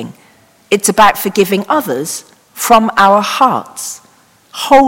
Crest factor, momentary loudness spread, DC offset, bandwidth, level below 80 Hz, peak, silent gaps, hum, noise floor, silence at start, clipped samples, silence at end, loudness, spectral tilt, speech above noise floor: 12 dB; 16 LU; under 0.1%; 17 kHz; -48 dBFS; 0 dBFS; none; none; -47 dBFS; 0 s; 1%; 0 s; -11 LUFS; -3.5 dB/octave; 36 dB